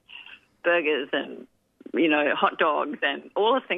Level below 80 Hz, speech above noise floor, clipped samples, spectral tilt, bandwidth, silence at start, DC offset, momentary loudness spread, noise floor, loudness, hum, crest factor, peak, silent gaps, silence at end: -78 dBFS; 23 dB; under 0.1%; -6.5 dB/octave; 4 kHz; 0.1 s; under 0.1%; 17 LU; -47 dBFS; -24 LUFS; none; 20 dB; -6 dBFS; none; 0 s